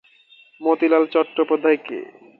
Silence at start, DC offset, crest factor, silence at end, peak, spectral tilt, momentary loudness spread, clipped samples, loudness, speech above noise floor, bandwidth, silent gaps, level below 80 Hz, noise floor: 0.6 s; under 0.1%; 16 dB; 0.35 s; -4 dBFS; -7 dB/octave; 11 LU; under 0.1%; -19 LUFS; 33 dB; 4.5 kHz; none; -78 dBFS; -52 dBFS